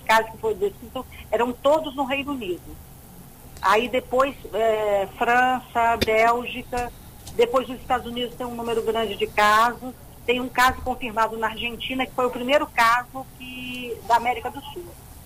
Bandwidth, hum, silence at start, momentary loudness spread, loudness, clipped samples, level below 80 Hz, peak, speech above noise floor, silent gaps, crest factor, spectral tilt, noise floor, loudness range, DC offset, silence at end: 16 kHz; none; 0 s; 15 LU; -23 LUFS; under 0.1%; -46 dBFS; -6 dBFS; 21 dB; none; 16 dB; -3.5 dB/octave; -44 dBFS; 3 LU; under 0.1%; 0 s